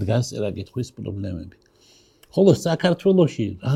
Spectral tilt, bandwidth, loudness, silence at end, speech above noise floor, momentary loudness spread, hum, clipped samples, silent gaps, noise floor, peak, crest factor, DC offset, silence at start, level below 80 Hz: -7 dB/octave; 14.5 kHz; -22 LUFS; 0 s; 35 dB; 13 LU; none; under 0.1%; none; -55 dBFS; -2 dBFS; 20 dB; under 0.1%; 0 s; -54 dBFS